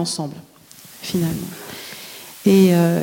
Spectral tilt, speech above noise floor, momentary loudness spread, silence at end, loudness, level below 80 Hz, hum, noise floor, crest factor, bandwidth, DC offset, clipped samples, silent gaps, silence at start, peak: -6 dB/octave; 27 dB; 21 LU; 0 s; -18 LUFS; -56 dBFS; none; -44 dBFS; 16 dB; 17 kHz; under 0.1%; under 0.1%; none; 0 s; -4 dBFS